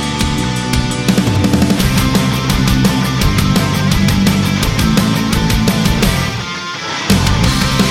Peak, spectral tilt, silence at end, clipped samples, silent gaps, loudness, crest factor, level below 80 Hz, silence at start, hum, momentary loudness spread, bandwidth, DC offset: 0 dBFS; -5 dB/octave; 0 s; under 0.1%; none; -13 LUFS; 12 dB; -22 dBFS; 0 s; none; 4 LU; 16.5 kHz; under 0.1%